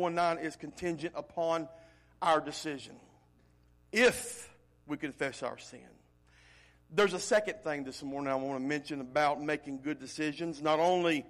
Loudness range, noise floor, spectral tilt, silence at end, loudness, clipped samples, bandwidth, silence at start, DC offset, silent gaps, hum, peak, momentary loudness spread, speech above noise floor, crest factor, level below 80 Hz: 3 LU; -65 dBFS; -4 dB/octave; 0 s; -33 LUFS; under 0.1%; 15 kHz; 0 s; under 0.1%; none; 60 Hz at -65 dBFS; -16 dBFS; 13 LU; 32 dB; 18 dB; -66 dBFS